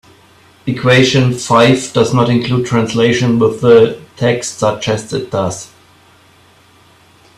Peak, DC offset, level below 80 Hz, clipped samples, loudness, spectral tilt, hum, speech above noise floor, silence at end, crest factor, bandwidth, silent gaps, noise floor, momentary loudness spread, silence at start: 0 dBFS; under 0.1%; -48 dBFS; under 0.1%; -12 LUFS; -5.5 dB/octave; none; 35 dB; 1.7 s; 14 dB; 13 kHz; none; -47 dBFS; 10 LU; 0.65 s